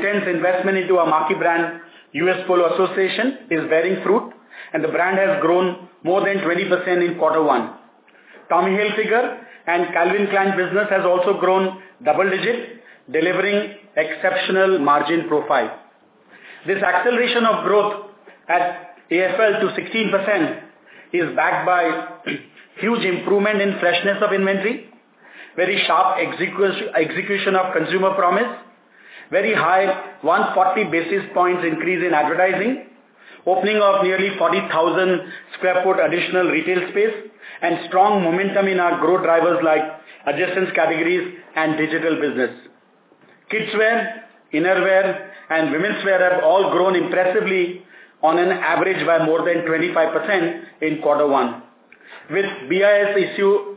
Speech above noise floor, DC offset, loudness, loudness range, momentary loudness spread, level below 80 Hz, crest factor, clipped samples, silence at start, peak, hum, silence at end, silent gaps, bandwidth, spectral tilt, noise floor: 36 dB; under 0.1%; -19 LUFS; 2 LU; 9 LU; -78 dBFS; 16 dB; under 0.1%; 0 s; -2 dBFS; none; 0 s; none; 4 kHz; -9 dB/octave; -54 dBFS